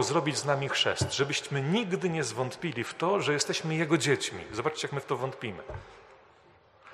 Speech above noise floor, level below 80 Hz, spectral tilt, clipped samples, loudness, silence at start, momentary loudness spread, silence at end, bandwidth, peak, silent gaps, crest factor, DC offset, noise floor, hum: 30 dB; -60 dBFS; -4 dB/octave; under 0.1%; -29 LUFS; 0 s; 8 LU; 0 s; 13 kHz; -10 dBFS; none; 20 dB; under 0.1%; -60 dBFS; none